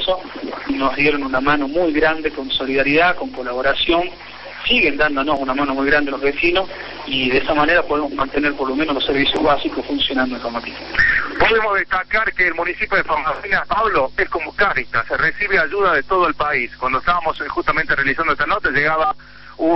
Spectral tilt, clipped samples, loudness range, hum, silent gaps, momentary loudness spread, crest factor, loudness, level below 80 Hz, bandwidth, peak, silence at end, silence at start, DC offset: -6 dB/octave; under 0.1%; 1 LU; none; none; 7 LU; 16 dB; -17 LUFS; -38 dBFS; 6 kHz; -2 dBFS; 0 s; 0 s; under 0.1%